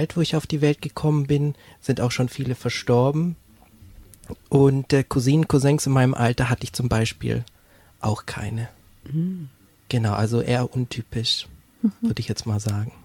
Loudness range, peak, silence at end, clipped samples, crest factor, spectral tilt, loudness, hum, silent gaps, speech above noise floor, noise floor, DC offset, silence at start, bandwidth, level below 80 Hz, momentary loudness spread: 7 LU; -6 dBFS; 0.15 s; under 0.1%; 16 dB; -6 dB/octave; -23 LUFS; none; none; 32 dB; -54 dBFS; under 0.1%; 0 s; 16 kHz; -46 dBFS; 11 LU